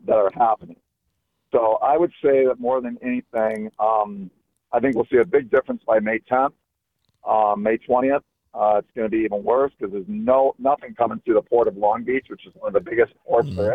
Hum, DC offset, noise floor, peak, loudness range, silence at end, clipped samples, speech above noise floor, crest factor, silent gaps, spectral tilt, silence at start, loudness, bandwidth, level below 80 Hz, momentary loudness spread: none; under 0.1%; -75 dBFS; -6 dBFS; 1 LU; 0 s; under 0.1%; 54 dB; 16 dB; none; -8.5 dB/octave; 0.05 s; -21 LUFS; 5 kHz; -58 dBFS; 8 LU